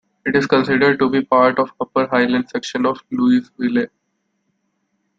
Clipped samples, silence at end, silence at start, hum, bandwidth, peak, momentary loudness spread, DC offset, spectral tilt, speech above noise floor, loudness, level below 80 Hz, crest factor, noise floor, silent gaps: under 0.1%; 1.35 s; 0.25 s; none; 7.6 kHz; -2 dBFS; 7 LU; under 0.1%; -6 dB/octave; 54 dB; -17 LUFS; -58 dBFS; 16 dB; -70 dBFS; none